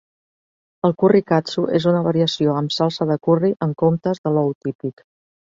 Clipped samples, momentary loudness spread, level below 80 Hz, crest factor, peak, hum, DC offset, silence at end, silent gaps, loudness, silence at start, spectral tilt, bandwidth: under 0.1%; 7 LU; -60 dBFS; 18 dB; -2 dBFS; none; under 0.1%; 0.65 s; 4.18-4.24 s, 4.55-4.61 s, 4.75-4.79 s; -19 LUFS; 0.85 s; -7 dB/octave; 7.6 kHz